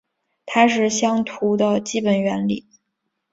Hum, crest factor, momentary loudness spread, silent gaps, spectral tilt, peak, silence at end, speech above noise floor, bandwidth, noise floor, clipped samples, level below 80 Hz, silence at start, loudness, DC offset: none; 20 dB; 7 LU; none; -4.5 dB/octave; -2 dBFS; 0.75 s; 57 dB; 8 kHz; -76 dBFS; under 0.1%; -62 dBFS; 0.45 s; -20 LUFS; under 0.1%